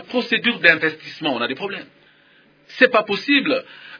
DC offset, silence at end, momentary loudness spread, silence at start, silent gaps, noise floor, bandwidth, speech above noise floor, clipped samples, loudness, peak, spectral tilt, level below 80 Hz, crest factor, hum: under 0.1%; 0 s; 13 LU; 0 s; none; -54 dBFS; 5.4 kHz; 34 dB; under 0.1%; -18 LUFS; 0 dBFS; -5 dB/octave; -68 dBFS; 20 dB; none